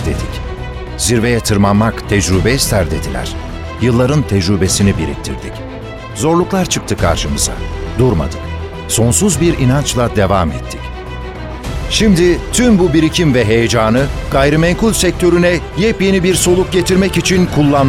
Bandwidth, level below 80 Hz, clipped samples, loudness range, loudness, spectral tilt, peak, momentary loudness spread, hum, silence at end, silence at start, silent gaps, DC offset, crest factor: 16.5 kHz; -24 dBFS; under 0.1%; 4 LU; -13 LUFS; -5 dB/octave; 0 dBFS; 14 LU; none; 0 s; 0 s; none; under 0.1%; 12 dB